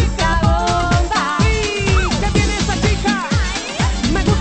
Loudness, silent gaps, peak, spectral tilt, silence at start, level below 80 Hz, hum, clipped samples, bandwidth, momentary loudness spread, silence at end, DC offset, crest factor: -17 LUFS; none; -2 dBFS; -5 dB/octave; 0 s; -22 dBFS; none; under 0.1%; 8.8 kHz; 3 LU; 0 s; under 0.1%; 14 dB